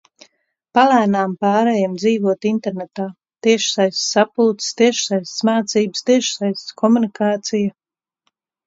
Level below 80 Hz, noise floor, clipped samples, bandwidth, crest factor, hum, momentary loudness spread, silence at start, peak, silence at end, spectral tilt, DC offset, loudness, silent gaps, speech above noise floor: -66 dBFS; -71 dBFS; under 0.1%; 8 kHz; 18 dB; none; 7 LU; 0.75 s; 0 dBFS; 0.95 s; -4 dB/octave; under 0.1%; -17 LUFS; none; 54 dB